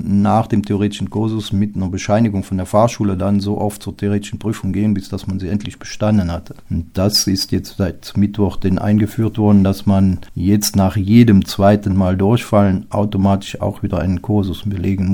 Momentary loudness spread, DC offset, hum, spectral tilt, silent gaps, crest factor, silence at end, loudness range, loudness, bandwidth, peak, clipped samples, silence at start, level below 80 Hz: 9 LU; under 0.1%; none; -6.5 dB/octave; none; 16 dB; 0 s; 6 LU; -16 LUFS; 18 kHz; 0 dBFS; under 0.1%; 0 s; -38 dBFS